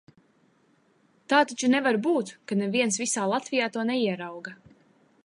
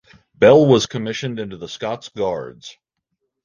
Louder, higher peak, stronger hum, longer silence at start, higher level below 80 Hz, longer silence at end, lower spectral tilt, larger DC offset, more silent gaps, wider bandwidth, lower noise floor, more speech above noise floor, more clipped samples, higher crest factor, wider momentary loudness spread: second, -25 LUFS vs -17 LUFS; second, -6 dBFS vs 0 dBFS; neither; first, 1.3 s vs 0.4 s; second, -78 dBFS vs -54 dBFS; about the same, 0.7 s vs 0.75 s; second, -3.5 dB/octave vs -5.5 dB/octave; neither; neither; first, 11.5 kHz vs 9.6 kHz; second, -65 dBFS vs -76 dBFS; second, 39 dB vs 58 dB; neither; about the same, 22 dB vs 18 dB; second, 10 LU vs 17 LU